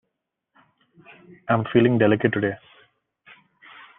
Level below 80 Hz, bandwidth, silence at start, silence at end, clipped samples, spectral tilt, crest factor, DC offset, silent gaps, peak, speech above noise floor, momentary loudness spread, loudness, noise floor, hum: -64 dBFS; 3.9 kHz; 1.5 s; 1.4 s; under 0.1%; -10.5 dB/octave; 22 dB; under 0.1%; none; -4 dBFS; 60 dB; 17 LU; -21 LUFS; -80 dBFS; none